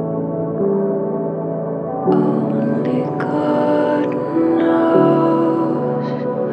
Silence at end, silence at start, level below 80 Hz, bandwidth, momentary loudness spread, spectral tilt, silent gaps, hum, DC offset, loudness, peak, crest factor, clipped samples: 0 s; 0 s; -62 dBFS; 5.6 kHz; 8 LU; -10 dB/octave; none; none; under 0.1%; -17 LUFS; -2 dBFS; 16 dB; under 0.1%